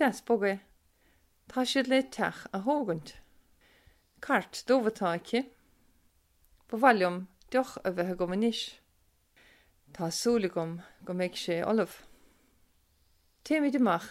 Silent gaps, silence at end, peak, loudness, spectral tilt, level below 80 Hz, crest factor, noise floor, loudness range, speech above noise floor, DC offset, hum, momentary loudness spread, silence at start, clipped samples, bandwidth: none; 0 s; -8 dBFS; -30 LUFS; -4.5 dB/octave; -66 dBFS; 24 dB; -69 dBFS; 3 LU; 40 dB; under 0.1%; none; 13 LU; 0 s; under 0.1%; 16 kHz